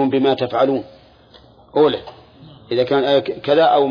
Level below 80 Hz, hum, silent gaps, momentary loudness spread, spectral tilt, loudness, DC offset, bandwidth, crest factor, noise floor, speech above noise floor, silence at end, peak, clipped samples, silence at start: -56 dBFS; none; none; 10 LU; -7.5 dB/octave; -17 LUFS; under 0.1%; 5.2 kHz; 14 dB; -47 dBFS; 31 dB; 0 s; -4 dBFS; under 0.1%; 0 s